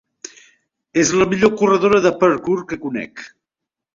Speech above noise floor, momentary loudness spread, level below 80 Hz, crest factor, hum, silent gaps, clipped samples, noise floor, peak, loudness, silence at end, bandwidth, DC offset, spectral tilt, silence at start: 68 dB; 23 LU; -52 dBFS; 16 dB; none; none; under 0.1%; -84 dBFS; -2 dBFS; -17 LUFS; 0.7 s; 7.6 kHz; under 0.1%; -4.5 dB/octave; 0.95 s